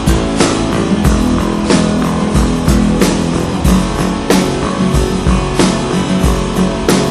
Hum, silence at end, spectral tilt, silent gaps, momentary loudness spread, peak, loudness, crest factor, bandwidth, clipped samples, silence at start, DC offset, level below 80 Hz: none; 0 s; -5.5 dB/octave; none; 3 LU; 0 dBFS; -13 LUFS; 12 dB; 15 kHz; under 0.1%; 0 s; under 0.1%; -20 dBFS